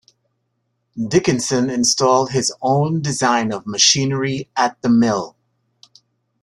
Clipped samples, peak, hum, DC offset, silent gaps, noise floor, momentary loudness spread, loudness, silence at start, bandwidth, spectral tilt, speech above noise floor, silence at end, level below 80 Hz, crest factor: under 0.1%; 0 dBFS; none; under 0.1%; none; -71 dBFS; 9 LU; -17 LUFS; 0.95 s; 12.5 kHz; -3.5 dB/octave; 53 dB; 1.15 s; -54 dBFS; 18 dB